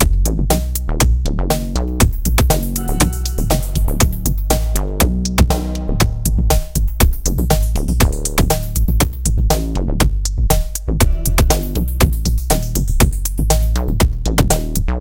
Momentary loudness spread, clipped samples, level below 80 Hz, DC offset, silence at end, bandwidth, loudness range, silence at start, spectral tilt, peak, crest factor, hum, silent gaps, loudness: 4 LU; under 0.1%; -16 dBFS; under 0.1%; 0 s; 17.5 kHz; 0 LU; 0 s; -4.5 dB/octave; 0 dBFS; 14 dB; none; none; -17 LUFS